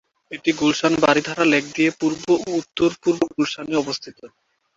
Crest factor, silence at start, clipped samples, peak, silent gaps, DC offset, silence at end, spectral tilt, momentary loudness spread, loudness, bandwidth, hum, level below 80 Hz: 20 dB; 0.3 s; under 0.1%; -2 dBFS; none; under 0.1%; 0.5 s; -4.5 dB/octave; 8 LU; -20 LUFS; 7.8 kHz; none; -58 dBFS